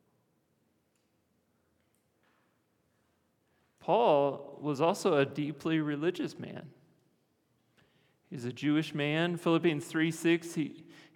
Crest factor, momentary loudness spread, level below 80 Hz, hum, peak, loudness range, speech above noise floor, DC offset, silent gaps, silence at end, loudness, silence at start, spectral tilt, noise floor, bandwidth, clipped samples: 20 dB; 14 LU; -88 dBFS; none; -14 dBFS; 7 LU; 44 dB; under 0.1%; none; 0.35 s; -31 LUFS; 3.85 s; -6 dB/octave; -75 dBFS; 16 kHz; under 0.1%